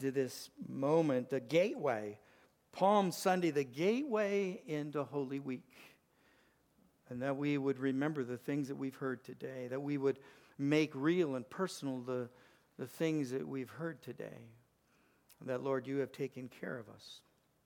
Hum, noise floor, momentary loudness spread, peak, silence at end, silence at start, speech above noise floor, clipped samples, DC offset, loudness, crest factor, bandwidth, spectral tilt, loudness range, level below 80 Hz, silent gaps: none; -73 dBFS; 16 LU; -18 dBFS; 0.45 s; 0 s; 36 dB; under 0.1%; under 0.1%; -37 LUFS; 20 dB; 19 kHz; -6 dB/octave; 8 LU; -84 dBFS; none